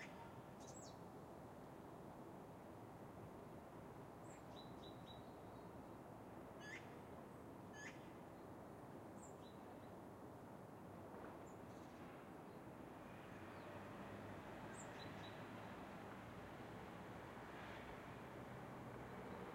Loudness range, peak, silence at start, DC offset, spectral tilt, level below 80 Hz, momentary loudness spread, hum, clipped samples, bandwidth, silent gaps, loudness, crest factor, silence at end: 3 LU; -42 dBFS; 0 s; under 0.1%; -5.5 dB/octave; -74 dBFS; 4 LU; none; under 0.1%; 16 kHz; none; -57 LUFS; 14 dB; 0 s